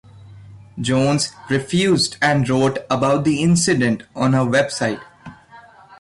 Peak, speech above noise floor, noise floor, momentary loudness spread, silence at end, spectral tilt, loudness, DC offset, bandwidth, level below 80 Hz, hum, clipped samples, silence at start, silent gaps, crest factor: -6 dBFS; 27 dB; -45 dBFS; 7 LU; 0.05 s; -5 dB/octave; -18 LUFS; under 0.1%; 11.5 kHz; -50 dBFS; none; under 0.1%; 0.15 s; none; 12 dB